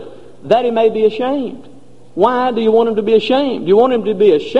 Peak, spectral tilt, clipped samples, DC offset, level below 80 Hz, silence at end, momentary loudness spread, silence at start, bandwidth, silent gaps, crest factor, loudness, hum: 0 dBFS; -7 dB/octave; under 0.1%; 2%; -54 dBFS; 0 s; 7 LU; 0 s; 7.8 kHz; none; 14 dB; -14 LUFS; none